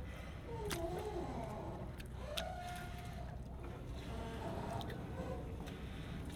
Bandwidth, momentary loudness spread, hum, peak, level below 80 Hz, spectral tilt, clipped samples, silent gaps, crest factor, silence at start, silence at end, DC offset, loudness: 18 kHz; 6 LU; none; -24 dBFS; -50 dBFS; -5.5 dB/octave; under 0.1%; none; 22 dB; 0 s; 0 s; under 0.1%; -46 LUFS